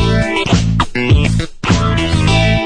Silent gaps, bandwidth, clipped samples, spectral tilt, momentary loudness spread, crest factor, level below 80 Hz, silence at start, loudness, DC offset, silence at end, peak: none; 10 kHz; under 0.1%; -5.5 dB/octave; 4 LU; 12 dB; -20 dBFS; 0 s; -14 LUFS; under 0.1%; 0 s; -2 dBFS